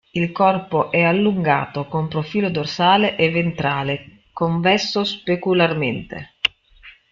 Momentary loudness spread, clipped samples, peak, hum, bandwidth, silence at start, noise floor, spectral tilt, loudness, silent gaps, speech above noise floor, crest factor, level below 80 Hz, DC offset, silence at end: 8 LU; under 0.1%; -2 dBFS; none; 7.4 kHz; 0.15 s; -47 dBFS; -6 dB/octave; -19 LUFS; none; 28 dB; 18 dB; -54 dBFS; under 0.1%; 0.2 s